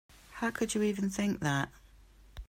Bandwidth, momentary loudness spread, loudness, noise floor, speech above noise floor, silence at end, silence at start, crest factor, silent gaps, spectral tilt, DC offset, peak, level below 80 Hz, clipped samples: 16 kHz; 7 LU; -33 LUFS; -58 dBFS; 26 dB; 0.05 s; 0.3 s; 16 dB; none; -5 dB/octave; under 0.1%; -18 dBFS; -54 dBFS; under 0.1%